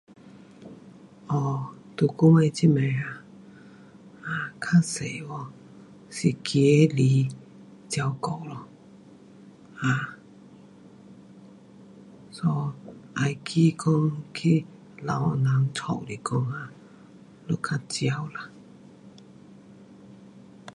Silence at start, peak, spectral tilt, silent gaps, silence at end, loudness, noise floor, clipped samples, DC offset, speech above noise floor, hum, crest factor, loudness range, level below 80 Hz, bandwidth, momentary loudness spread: 0.25 s; -6 dBFS; -6.5 dB/octave; none; 0.05 s; -25 LUFS; -50 dBFS; under 0.1%; under 0.1%; 26 dB; none; 20 dB; 10 LU; -64 dBFS; 11.5 kHz; 23 LU